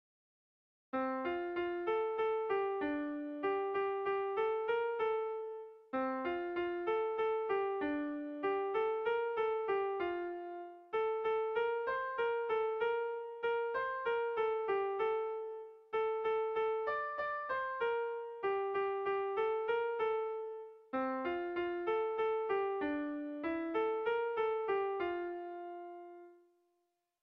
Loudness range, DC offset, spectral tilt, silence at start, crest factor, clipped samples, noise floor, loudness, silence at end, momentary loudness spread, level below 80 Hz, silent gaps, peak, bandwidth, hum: 1 LU; under 0.1%; -6.5 dB/octave; 0.95 s; 12 dB; under 0.1%; -83 dBFS; -37 LUFS; 0.85 s; 7 LU; -74 dBFS; none; -24 dBFS; 5.4 kHz; none